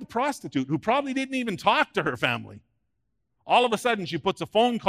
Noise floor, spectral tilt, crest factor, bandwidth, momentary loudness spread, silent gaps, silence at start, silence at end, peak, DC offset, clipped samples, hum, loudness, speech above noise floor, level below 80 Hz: -78 dBFS; -4.5 dB/octave; 20 dB; 15.5 kHz; 6 LU; none; 0 s; 0 s; -6 dBFS; under 0.1%; under 0.1%; none; -25 LUFS; 53 dB; -64 dBFS